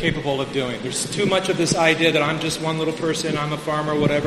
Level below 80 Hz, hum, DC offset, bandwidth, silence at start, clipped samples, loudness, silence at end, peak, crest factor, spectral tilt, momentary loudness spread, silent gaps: -48 dBFS; none; under 0.1%; 13.5 kHz; 0 s; under 0.1%; -21 LUFS; 0 s; -2 dBFS; 20 dB; -4 dB/octave; 7 LU; none